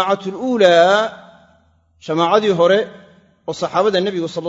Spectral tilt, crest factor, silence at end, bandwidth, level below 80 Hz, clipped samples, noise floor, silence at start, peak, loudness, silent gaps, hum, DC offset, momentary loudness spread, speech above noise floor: -5 dB/octave; 16 dB; 0 s; 7.8 kHz; -62 dBFS; under 0.1%; -56 dBFS; 0 s; 0 dBFS; -15 LUFS; none; none; under 0.1%; 17 LU; 40 dB